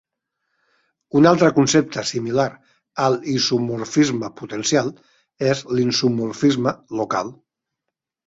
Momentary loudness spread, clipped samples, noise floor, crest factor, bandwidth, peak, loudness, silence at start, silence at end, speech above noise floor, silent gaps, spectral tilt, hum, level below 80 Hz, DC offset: 10 LU; under 0.1%; -83 dBFS; 18 dB; 8 kHz; -2 dBFS; -20 LUFS; 1.15 s; 0.95 s; 63 dB; none; -5 dB/octave; none; -60 dBFS; under 0.1%